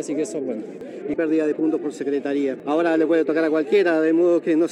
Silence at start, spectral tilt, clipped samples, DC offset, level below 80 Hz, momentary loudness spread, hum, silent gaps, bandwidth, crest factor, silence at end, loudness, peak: 0 s; -5.5 dB/octave; under 0.1%; under 0.1%; -70 dBFS; 10 LU; none; none; 10.5 kHz; 12 dB; 0 s; -21 LUFS; -8 dBFS